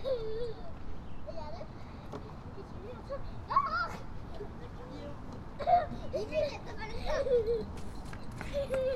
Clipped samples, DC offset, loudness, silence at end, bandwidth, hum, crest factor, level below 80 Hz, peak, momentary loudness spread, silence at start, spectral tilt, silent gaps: under 0.1%; under 0.1%; -36 LUFS; 0 s; 13 kHz; none; 20 dB; -46 dBFS; -16 dBFS; 16 LU; 0 s; -6.5 dB/octave; none